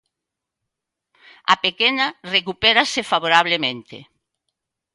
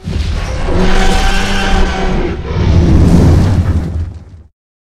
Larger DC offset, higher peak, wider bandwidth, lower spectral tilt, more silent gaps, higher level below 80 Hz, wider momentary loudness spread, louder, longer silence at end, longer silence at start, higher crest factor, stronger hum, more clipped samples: neither; about the same, 0 dBFS vs 0 dBFS; about the same, 11.5 kHz vs 12 kHz; second, -2.5 dB/octave vs -6 dB/octave; neither; second, -60 dBFS vs -14 dBFS; about the same, 8 LU vs 10 LU; second, -18 LUFS vs -12 LUFS; first, 0.9 s vs 0.5 s; first, 1.5 s vs 0 s; first, 22 dB vs 10 dB; neither; second, under 0.1% vs 0.2%